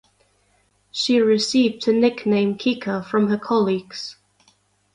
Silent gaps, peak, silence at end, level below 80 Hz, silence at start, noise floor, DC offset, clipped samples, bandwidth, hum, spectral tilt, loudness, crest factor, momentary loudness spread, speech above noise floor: none; -6 dBFS; 0.8 s; -64 dBFS; 0.95 s; -63 dBFS; under 0.1%; under 0.1%; 11 kHz; 50 Hz at -40 dBFS; -5 dB/octave; -20 LUFS; 16 dB; 12 LU; 43 dB